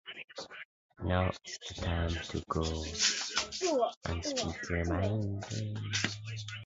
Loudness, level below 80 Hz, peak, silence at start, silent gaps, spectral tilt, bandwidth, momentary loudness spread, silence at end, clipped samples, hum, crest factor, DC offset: -34 LUFS; -44 dBFS; -14 dBFS; 0.05 s; 0.24-0.28 s, 0.65-0.89 s, 3.96-4.01 s; -4 dB/octave; 8 kHz; 14 LU; 0 s; under 0.1%; none; 20 dB; under 0.1%